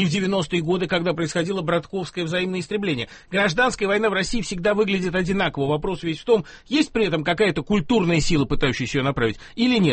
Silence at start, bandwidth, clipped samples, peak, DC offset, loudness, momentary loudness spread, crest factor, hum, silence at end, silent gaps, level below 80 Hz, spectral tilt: 0 s; 8.8 kHz; under 0.1%; -6 dBFS; under 0.1%; -22 LUFS; 5 LU; 16 dB; none; 0 s; none; -38 dBFS; -5.5 dB/octave